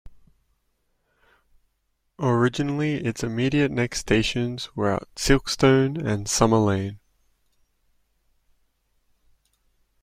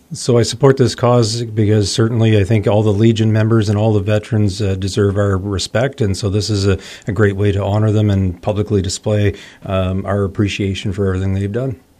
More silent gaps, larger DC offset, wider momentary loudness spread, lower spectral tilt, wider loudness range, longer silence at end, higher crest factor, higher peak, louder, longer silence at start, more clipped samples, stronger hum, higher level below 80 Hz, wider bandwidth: neither; neither; about the same, 8 LU vs 6 LU; second, -5 dB/octave vs -6.5 dB/octave; about the same, 6 LU vs 4 LU; first, 3.05 s vs 0.25 s; first, 22 dB vs 14 dB; about the same, -2 dBFS vs 0 dBFS; second, -23 LUFS vs -16 LUFS; about the same, 0.05 s vs 0.1 s; neither; neither; about the same, -42 dBFS vs -42 dBFS; first, 16 kHz vs 11 kHz